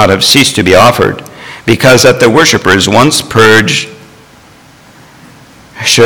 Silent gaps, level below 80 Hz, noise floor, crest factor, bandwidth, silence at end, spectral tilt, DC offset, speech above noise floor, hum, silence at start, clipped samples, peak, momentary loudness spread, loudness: none; -38 dBFS; -38 dBFS; 8 dB; over 20 kHz; 0 s; -3.5 dB/octave; under 0.1%; 32 dB; none; 0 s; 4%; 0 dBFS; 10 LU; -6 LUFS